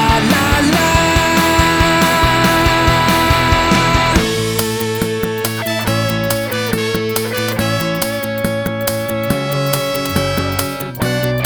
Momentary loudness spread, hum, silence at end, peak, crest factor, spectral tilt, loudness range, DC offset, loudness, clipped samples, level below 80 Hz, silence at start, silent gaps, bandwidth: 7 LU; none; 0 s; 0 dBFS; 14 dB; -4.5 dB/octave; 6 LU; under 0.1%; -14 LUFS; under 0.1%; -28 dBFS; 0 s; none; over 20 kHz